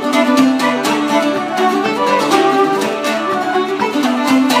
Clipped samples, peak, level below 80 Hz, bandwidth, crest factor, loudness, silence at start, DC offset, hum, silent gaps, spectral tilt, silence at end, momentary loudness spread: under 0.1%; 0 dBFS; -66 dBFS; 15.5 kHz; 14 dB; -14 LUFS; 0 s; under 0.1%; none; none; -3.5 dB/octave; 0 s; 5 LU